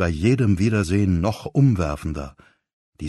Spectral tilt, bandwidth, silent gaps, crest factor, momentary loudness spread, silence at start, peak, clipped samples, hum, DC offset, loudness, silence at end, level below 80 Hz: -7.5 dB/octave; 12.5 kHz; 2.73-2.92 s; 14 dB; 11 LU; 0 s; -6 dBFS; under 0.1%; none; under 0.1%; -21 LUFS; 0 s; -38 dBFS